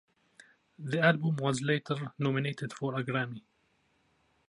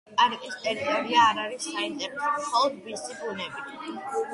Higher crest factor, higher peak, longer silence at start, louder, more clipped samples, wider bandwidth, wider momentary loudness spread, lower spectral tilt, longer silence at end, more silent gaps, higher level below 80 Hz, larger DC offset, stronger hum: about the same, 22 dB vs 20 dB; about the same, -10 dBFS vs -8 dBFS; first, 0.8 s vs 0.1 s; second, -31 LUFS vs -27 LUFS; neither; about the same, 11.5 kHz vs 11.5 kHz; second, 11 LU vs 15 LU; first, -6 dB/octave vs -2 dB/octave; first, 1.1 s vs 0 s; neither; second, -76 dBFS vs -70 dBFS; neither; neither